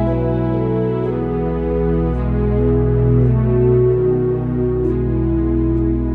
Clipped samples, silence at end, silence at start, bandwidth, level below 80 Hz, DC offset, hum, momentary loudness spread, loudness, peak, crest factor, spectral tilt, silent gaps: under 0.1%; 0 s; 0 s; 3.8 kHz; -24 dBFS; under 0.1%; none; 5 LU; -17 LUFS; -4 dBFS; 12 dB; -12.5 dB/octave; none